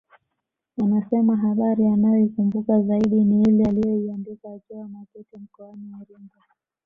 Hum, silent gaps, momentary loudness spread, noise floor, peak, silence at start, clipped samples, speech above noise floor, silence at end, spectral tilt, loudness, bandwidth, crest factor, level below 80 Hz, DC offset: none; none; 22 LU; -81 dBFS; -8 dBFS; 0.8 s; under 0.1%; 59 dB; 0.6 s; -10.5 dB/octave; -20 LUFS; 3.7 kHz; 14 dB; -56 dBFS; under 0.1%